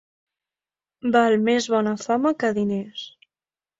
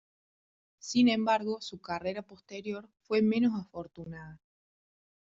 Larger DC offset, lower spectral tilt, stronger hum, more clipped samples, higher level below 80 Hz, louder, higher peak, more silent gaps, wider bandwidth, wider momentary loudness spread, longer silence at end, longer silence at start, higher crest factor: neither; about the same, -5 dB/octave vs -4 dB/octave; neither; neither; first, -64 dBFS vs -70 dBFS; first, -22 LUFS vs -30 LUFS; first, -4 dBFS vs -14 dBFS; neither; about the same, 8 kHz vs 7.8 kHz; second, 15 LU vs 19 LU; second, 0.7 s vs 0.95 s; first, 1.05 s vs 0.85 s; about the same, 20 dB vs 18 dB